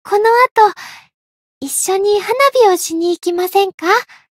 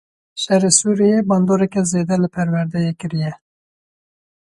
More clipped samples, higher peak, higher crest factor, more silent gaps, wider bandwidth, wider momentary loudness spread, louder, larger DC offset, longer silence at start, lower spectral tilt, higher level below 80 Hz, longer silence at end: neither; about the same, 0 dBFS vs 0 dBFS; about the same, 14 dB vs 18 dB; first, 0.51-0.55 s, 1.14-1.61 s, 3.74-3.78 s vs none; first, 16.5 kHz vs 11.5 kHz; about the same, 9 LU vs 11 LU; first, -13 LUFS vs -17 LUFS; neither; second, 0.05 s vs 0.35 s; second, -1 dB/octave vs -5 dB/octave; second, -64 dBFS vs -56 dBFS; second, 0.35 s vs 1.25 s